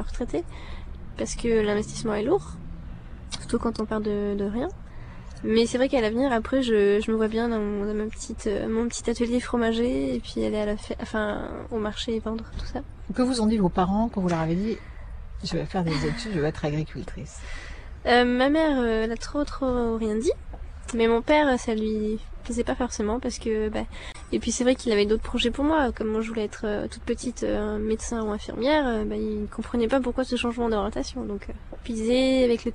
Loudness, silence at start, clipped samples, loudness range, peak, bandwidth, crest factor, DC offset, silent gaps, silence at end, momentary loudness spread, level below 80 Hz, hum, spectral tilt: -26 LUFS; 0 s; under 0.1%; 4 LU; -6 dBFS; 10.5 kHz; 20 dB; under 0.1%; none; 0 s; 15 LU; -38 dBFS; none; -5 dB/octave